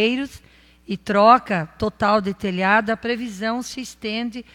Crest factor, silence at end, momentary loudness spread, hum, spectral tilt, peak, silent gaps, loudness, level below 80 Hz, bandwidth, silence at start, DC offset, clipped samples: 20 dB; 0.15 s; 16 LU; none; -5 dB/octave; -2 dBFS; none; -20 LUFS; -52 dBFS; 15 kHz; 0 s; under 0.1%; under 0.1%